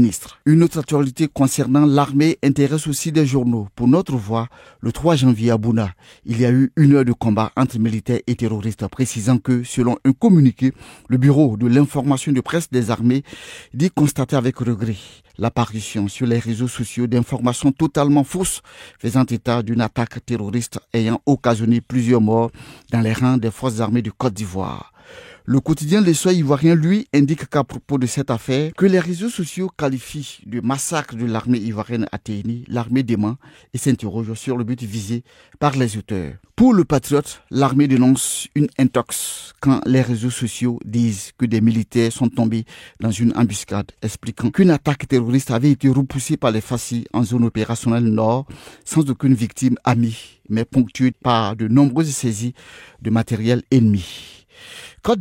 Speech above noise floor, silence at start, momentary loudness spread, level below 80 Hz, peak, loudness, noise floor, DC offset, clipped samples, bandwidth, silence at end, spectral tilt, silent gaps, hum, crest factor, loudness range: 24 dB; 0 s; 11 LU; -48 dBFS; -4 dBFS; -19 LUFS; -42 dBFS; under 0.1%; under 0.1%; 16.5 kHz; 0 s; -6.5 dB/octave; none; none; 14 dB; 5 LU